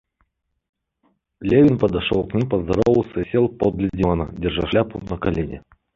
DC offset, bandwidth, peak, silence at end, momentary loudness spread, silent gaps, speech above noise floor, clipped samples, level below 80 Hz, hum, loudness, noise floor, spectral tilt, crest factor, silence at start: under 0.1%; 7.4 kHz; -4 dBFS; 0.35 s; 10 LU; none; 49 dB; under 0.1%; -38 dBFS; none; -20 LUFS; -68 dBFS; -8.5 dB/octave; 18 dB; 1.4 s